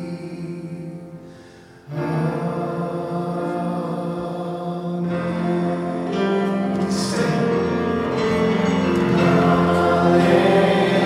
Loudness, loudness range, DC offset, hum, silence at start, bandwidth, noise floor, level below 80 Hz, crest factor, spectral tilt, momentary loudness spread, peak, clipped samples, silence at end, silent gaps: -20 LUFS; 9 LU; under 0.1%; none; 0 s; 12 kHz; -44 dBFS; -50 dBFS; 18 dB; -7 dB/octave; 15 LU; -2 dBFS; under 0.1%; 0 s; none